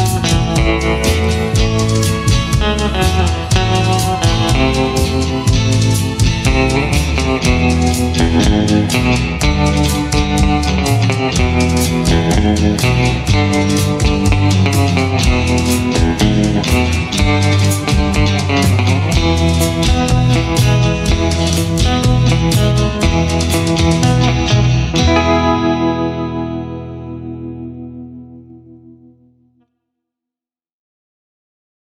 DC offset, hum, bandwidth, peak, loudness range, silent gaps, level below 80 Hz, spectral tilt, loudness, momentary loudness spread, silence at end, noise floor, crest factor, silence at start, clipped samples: under 0.1%; none; 16 kHz; -2 dBFS; 3 LU; none; -22 dBFS; -5.5 dB/octave; -13 LUFS; 3 LU; 3.15 s; -88 dBFS; 12 dB; 0 s; under 0.1%